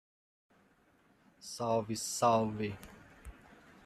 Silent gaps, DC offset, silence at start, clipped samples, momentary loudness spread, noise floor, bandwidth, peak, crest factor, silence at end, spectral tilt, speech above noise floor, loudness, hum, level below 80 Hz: none; under 0.1%; 1.4 s; under 0.1%; 25 LU; -68 dBFS; 15 kHz; -16 dBFS; 22 dB; 0.55 s; -4.5 dB/octave; 35 dB; -33 LUFS; none; -62 dBFS